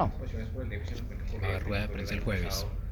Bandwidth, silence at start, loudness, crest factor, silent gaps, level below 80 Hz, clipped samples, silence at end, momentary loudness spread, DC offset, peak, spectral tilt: over 20 kHz; 0 s; -34 LUFS; 16 dB; none; -36 dBFS; under 0.1%; 0 s; 7 LU; under 0.1%; -16 dBFS; -5.5 dB/octave